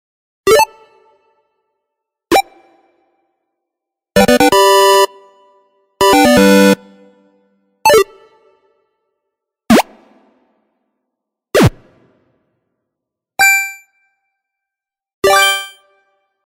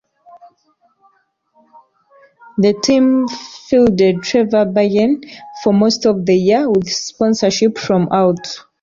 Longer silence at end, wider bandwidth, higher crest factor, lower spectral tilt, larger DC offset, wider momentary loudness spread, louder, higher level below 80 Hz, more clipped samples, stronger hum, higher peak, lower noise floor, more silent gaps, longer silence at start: first, 0.8 s vs 0.2 s; first, 16.5 kHz vs 7.6 kHz; about the same, 16 dB vs 14 dB; second, -4 dB/octave vs -5.5 dB/octave; neither; about the same, 11 LU vs 9 LU; first, -11 LUFS vs -14 LUFS; first, -42 dBFS vs -52 dBFS; neither; neither; about the same, 0 dBFS vs -2 dBFS; first, -85 dBFS vs -60 dBFS; first, 15.14-15.22 s vs none; about the same, 0.45 s vs 0.35 s